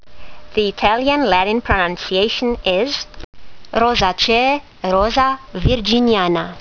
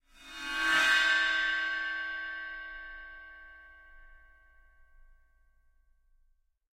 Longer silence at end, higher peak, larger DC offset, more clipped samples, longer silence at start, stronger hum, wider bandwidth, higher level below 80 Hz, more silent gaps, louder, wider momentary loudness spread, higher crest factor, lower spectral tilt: second, 0 s vs 2.55 s; first, 0 dBFS vs -14 dBFS; neither; neither; second, 0 s vs 0.2 s; neither; second, 5.4 kHz vs 16 kHz; first, -32 dBFS vs -60 dBFS; first, 3.24-3.33 s vs none; first, -16 LUFS vs -28 LUFS; second, 7 LU vs 24 LU; about the same, 18 dB vs 20 dB; first, -5 dB/octave vs 0.5 dB/octave